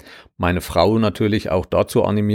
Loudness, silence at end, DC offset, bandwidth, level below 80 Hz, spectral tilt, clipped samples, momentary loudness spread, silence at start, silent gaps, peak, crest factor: -19 LUFS; 0 s; under 0.1%; 17 kHz; -40 dBFS; -6.5 dB/octave; under 0.1%; 5 LU; 0.05 s; none; -2 dBFS; 16 dB